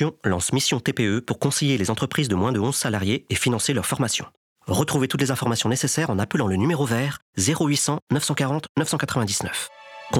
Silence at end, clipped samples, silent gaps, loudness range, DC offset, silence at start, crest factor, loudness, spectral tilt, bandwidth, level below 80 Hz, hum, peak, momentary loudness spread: 0 s; under 0.1%; 4.37-4.56 s, 7.22-7.33 s, 8.02-8.07 s, 8.69-8.75 s; 1 LU; under 0.1%; 0 s; 14 dB; -23 LUFS; -4 dB/octave; 18 kHz; -54 dBFS; none; -8 dBFS; 4 LU